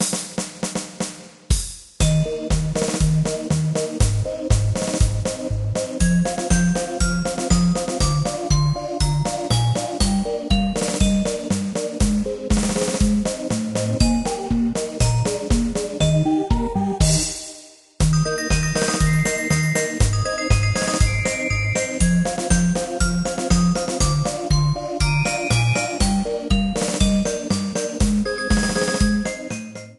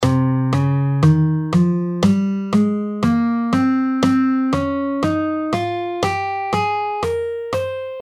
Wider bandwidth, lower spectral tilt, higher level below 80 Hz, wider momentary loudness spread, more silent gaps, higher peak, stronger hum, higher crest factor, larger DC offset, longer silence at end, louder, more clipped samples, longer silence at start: about the same, 12.5 kHz vs 13 kHz; second, -5 dB/octave vs -7.5 dB/octave; first, -28 dBFS vs -46 dBFS; about the same, 5 LU vs 6 LU; neither; about the same, -4 dBFS vs -2 dBFS; neither; about the same, 16 dB vs 16 dB; neither; about the same, 0.05 s vs 0 s; about the same, -21 LUFS vs -19 LUFS; neither; about the same, 0 s vs 0 s